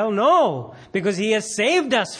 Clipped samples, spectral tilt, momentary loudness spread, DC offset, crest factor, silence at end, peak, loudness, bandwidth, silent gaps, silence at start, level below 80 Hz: under 0.1%; -4 dB/octave; 9 LU; under 0.1%; 14 dB; 0 s; -6 dBFS; -20 LUFS; 10.5 kHz; none; 0 s; -64 dBFS